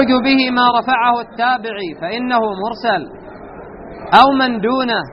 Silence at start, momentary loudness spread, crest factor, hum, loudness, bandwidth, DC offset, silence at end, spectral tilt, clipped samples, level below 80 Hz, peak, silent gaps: 0 s; 23 LU; 16 dB; none; -15 LUFS; 6 kHz; under 0.1%; 0 s; -1.5 dB/octave; under 0.1%; -48 dBFS; 0 dBFS; none